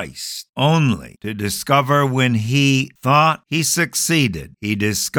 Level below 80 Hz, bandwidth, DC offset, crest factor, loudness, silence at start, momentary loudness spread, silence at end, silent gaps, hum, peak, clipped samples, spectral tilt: -50 dBFS; 19 kHz; under 0.1%; 16 dB; -17 LUFS; 0 s; 11 LU; 0 s; 0.49-0.53 s; none; -2 dBFS; under 0.1%; -4.5 dB/octave